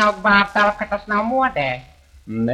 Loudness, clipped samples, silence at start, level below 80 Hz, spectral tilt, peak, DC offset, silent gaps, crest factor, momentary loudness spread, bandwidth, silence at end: -18 LUFS; under 0.1%; 0 s; -46 dBFS; -5.5 dB/octave; -2 dBFS; under 0.1%; none; 18 dB; 12 LU; 11.5 kHz; 0 s